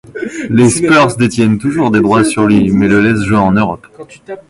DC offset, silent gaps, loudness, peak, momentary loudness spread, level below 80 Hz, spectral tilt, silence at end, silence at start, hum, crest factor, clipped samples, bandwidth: under 0.1%; none; -10 LUFS; 0 dBFS; 10 LU; -38 dBFS; -6 dB/octave; 0.1 s; 0.15 s; none; 10 dB; under 0.1%; 11.5 kHz